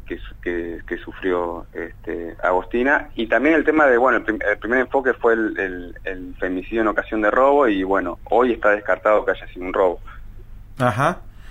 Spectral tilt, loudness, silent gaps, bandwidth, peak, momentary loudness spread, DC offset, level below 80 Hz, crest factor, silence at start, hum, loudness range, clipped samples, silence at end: -7 dB/octave; -20 LUFS; none; 12 kHz; -4 dBFS; 15 LU; under 0.1%; -40 dBFS; 16 dB; 0 s; none; 3 LU; under 0.1%; 0 s